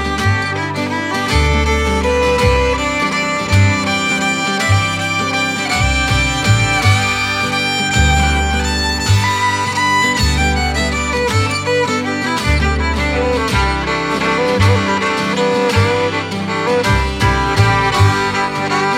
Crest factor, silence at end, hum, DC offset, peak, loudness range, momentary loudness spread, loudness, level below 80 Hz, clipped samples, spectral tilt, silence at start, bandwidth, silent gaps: 14 dB; 0 s; none; under 0.1%; 0 dBFS; 2 LU; 4 LU; -14 LUFS; -24 dBFS; under 0.1%; -4.5 dB/octave; 0 s; 15.5 kHz; none